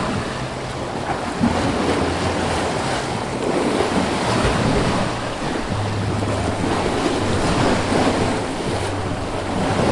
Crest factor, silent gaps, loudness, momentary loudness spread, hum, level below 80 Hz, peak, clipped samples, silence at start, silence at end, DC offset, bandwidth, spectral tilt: 16 dB; none; -21 LUFS; 6 LU; none; -36 dBFS; -4 dBFS; under 0.1%; 0 s; 0 s; under 0.1%; 11.5 kHz; -5 dB/octave